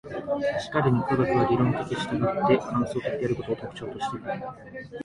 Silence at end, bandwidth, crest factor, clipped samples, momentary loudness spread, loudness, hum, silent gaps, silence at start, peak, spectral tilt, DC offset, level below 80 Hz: 0 s; 11 kHz; 18 dB; under 0.1%; 12 LU; -26 LUFS; none; none; 0.05 s; -10 dBFS; -7.5 dB/octave; under 0.1%; -54 dBFS